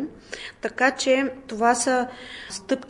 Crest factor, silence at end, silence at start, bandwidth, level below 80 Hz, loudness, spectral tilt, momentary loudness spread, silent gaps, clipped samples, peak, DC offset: 18 dB; 0 s; 0 s; 11.5 kHz; -58 dBFS; -23 LUFS; -2 dB/octave; 16 LU; none; under 0.1%; -6 dBFS; under 0.1%